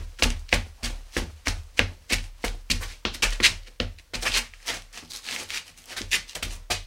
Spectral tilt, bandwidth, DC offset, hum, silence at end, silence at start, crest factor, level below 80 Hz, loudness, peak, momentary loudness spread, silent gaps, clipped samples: -1.5 dB/octave; 17 kHz; under 0.1%; none; 0 s; 0 s; 28 dB; -36 dBFS; -27 LUFS; 0 dBFS; 13 LU; none; under 0.1%